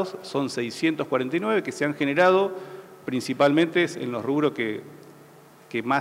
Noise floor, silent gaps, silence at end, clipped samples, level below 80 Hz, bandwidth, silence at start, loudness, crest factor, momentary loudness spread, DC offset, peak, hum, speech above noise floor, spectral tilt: -50 dBFS; none; 0 s; under 0.1%; -76 dBFS; 16 kHz; 0 s; -24 LUFS; 18 dB; 12 LU; under 0.1%; -6 dBFS; none; 26 dB; -5.5 dB/octave